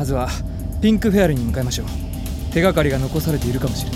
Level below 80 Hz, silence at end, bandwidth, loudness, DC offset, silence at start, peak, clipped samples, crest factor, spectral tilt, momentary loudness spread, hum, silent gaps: -28 dBFS; 0 s; 16.5 kHz; -20 LUFS; under 0.1%; 0 s; -4 dBFS; under 0.1%; 16 dB; -6 dB/octave; 11 LU; none; none